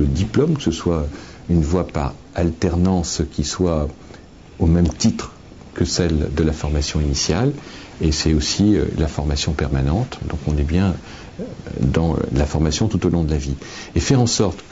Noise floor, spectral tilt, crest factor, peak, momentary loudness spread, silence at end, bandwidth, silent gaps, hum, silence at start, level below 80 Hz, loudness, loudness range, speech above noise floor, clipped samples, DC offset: -40 dBFS; -5.5 dB/octave; 14 dB; -4 dBFS; 12 LU; 0.05 s; 8 kHz; none; none; 0 s; -28 dBFS; -20 LUFS; 2 LU; 21 dB; under 0.1%; 0.2%